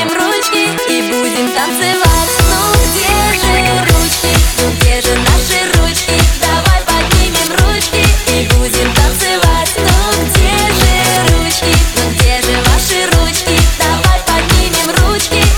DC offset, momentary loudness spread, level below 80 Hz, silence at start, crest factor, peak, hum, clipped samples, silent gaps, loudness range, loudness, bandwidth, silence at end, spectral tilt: under 0.1%; 2 LU; -16 dBFS; 0 s; 10 dB; 0 dBFS; none; under 0.1%; none; 1 LU; -10 LUFS; over 20 kHz; 0 s; -3.5 dB/octave